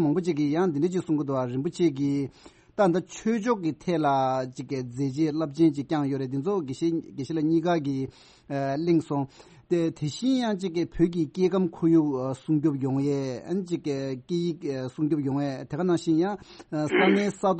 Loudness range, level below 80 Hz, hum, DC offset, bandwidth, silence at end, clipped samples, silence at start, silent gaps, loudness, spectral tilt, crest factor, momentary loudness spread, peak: 3 LU; -58 dBFS; none; under 0.1%; 8.4 kHz; 0 s; under 0.1%; 0 s; none; -27 LUFS; -7 dB/octave; 18 dB; 8 LU; -8 dBFS